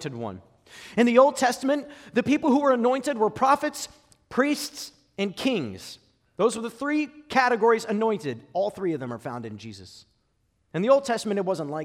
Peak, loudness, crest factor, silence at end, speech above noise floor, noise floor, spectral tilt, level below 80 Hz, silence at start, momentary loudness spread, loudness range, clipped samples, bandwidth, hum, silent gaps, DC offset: -6 dBFS; -24 LUFS; 20 dB; 0 s; 46 dB; -70 dBFS; -5 dB/octave; -66 dBFS; 0 s; 16 LU; 6 LU; under 0.1%; 16 kHz; none; none; under 0.1%